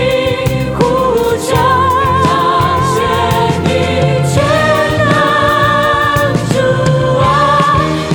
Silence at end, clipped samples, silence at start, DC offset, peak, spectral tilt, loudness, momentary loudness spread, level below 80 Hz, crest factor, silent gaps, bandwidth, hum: 0 s; under 0.1%; 0 s; under 0.1%; 0 dBFS; -5.5 dB/octave; -11 LUFS; 3 LU; -30 dBFS; 10 dB; none; over 20 kHz; none